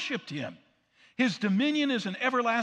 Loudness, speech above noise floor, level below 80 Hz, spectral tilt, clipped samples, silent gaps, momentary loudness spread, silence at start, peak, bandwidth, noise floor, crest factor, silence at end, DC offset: -28 LUFS; 35 dB; -82 dBFS; -5 dB/octave; under 0.1%; none; 12 LU; 0 s; -14 dBFS; 9.8 kHz; -64 dBFS; 16 dB; 0 s; under 0.1%